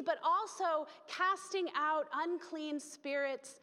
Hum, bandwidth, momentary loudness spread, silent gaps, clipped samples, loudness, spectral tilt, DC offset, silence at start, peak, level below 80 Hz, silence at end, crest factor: none; 13.5 kHz; 8 LU; none; under 0.1%; -36 LUFS; -1.5 dB/octave; under 0.1%; 0 s; -22 dBFS; under -90 dBFS; 0.05 s; 16 dB